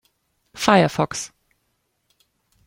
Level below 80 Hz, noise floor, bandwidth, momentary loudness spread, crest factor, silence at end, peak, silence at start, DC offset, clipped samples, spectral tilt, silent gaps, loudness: -56 dBFS; -71 dBFS; 16.5 kHz; 15 LU; 22 dB; 1.4 s; -2 dBFS; 0.55 s; under 0.1%; under 0.1%; -4.5 dB/octave; none; -19 LUFS